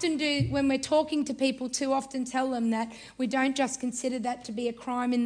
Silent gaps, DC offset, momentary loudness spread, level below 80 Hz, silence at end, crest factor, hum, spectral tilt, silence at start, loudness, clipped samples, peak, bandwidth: none; under 0.1%; 7 LU; -58 dBFS; 0 s; 16 dB; none; -4.5 dB/octave; 0 s; -29 LUFS; under 0.1%; -14 dBFS; 10 kHz